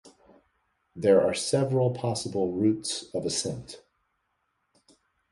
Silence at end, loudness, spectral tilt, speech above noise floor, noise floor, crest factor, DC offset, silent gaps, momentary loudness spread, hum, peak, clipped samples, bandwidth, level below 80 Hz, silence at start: 1.55 s; -26 LUFS; -5 dB/octave; 50 dB; -76 dBFS; 20 dB; under 0.1%; none; 12 LU; none; -10 dBFS; under 0.1%; 11.5 kHz; -62 dBFS; 0.05 s